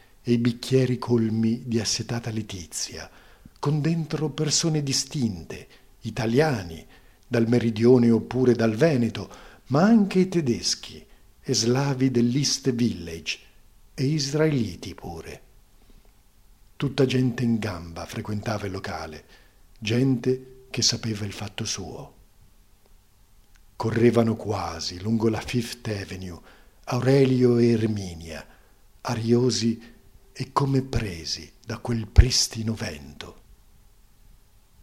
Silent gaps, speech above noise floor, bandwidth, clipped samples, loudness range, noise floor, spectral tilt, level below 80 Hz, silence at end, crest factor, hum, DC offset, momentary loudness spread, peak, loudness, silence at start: none; 33 dB; 15 kHz; under 0.1%; 6 LU; -57 dBFS; -5 dB/octave; -38 dBFS; 1.5 s; 24 dB; none; under 0.1%; 18 LU; 0 dBFS; -24 LUFS; 0.25 s